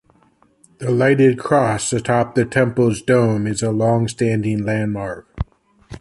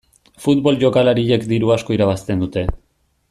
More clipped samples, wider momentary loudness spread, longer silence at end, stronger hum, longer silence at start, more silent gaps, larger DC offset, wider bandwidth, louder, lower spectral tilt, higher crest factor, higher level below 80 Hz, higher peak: neither; first, 13 LU vs 9 LU; second, 0 s vs 0.55 s; neither; first, 0.8 s vs 0.4 s; neither; neither; second, 11.5 kHz vs 13.5 kHz; about the same, -18 LUFS vs -17 LUFS; about the same, -6 dB/octave vs -7 dB/octave; about the same, 16 dB vs 16 dB; second, -42 dBFS vs -36 dBFS; about the same, -2 dBFS vs -2 dBFS